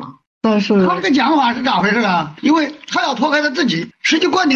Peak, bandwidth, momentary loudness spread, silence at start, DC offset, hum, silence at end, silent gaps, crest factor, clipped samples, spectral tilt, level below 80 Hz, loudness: -4 dBFS; 8.2 kHz; 5 LU; 0 s; under 0.1%; none; 0 s; 0.27-0.41 s; 12 dB; under 0.1%; -4.5 dB/octave; -58 dBFS; -15 LUFS